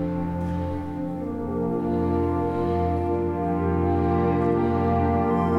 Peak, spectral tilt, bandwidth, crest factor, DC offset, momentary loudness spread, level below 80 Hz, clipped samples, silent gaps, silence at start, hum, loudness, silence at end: -10 dBFS; -10 dB/octave; 5.6 kHz; 14 dB; under 0.1%; 7 LU; -44 dBFS; under 0.1%; none; 0 s; none; -24 LUFS; 0 s